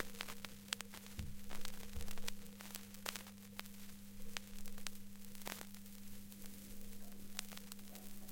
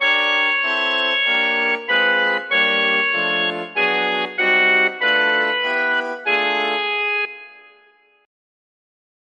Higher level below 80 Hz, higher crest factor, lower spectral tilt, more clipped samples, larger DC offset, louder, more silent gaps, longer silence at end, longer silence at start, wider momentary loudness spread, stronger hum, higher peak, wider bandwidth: first, -56 dBFS vs -78 dBFS; first, 30 dB vs 14 dB; about the same, -2.5 dB/octave vs -3 dB/octave; neither; neither; second, -50 LUFS vs -17 LUFS; neither; second, 0 s vs 1.65 s; about the same, 0 s vs 0 s; first, 8 LU vs 5 LU; neither; second, -16 dBFS vs -4 dBFS; first, 17 kHz vs 9.4 kHz